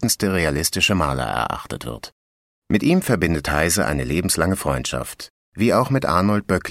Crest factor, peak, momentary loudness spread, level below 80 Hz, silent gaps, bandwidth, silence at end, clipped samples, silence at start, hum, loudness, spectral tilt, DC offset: 18 dB; -2 dBFS; 13 LU; -38 dBFS; 2.12-2.62 s, 5.30-5.52 s; 16 kHz; 0 s; under 0.1%; 0 s; none; -20 LUFS; -4.5 dB/octave; under 0.1%